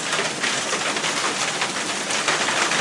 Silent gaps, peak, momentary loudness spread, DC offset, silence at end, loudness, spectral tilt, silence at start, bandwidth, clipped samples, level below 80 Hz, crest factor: none; -6 dBFS; 3 LU; under 0.1%; 0 s; -21 LUFS; -1 dB/octave; 0 s; 12 kHz; under 0.1%; -68 dBFS; 16 dB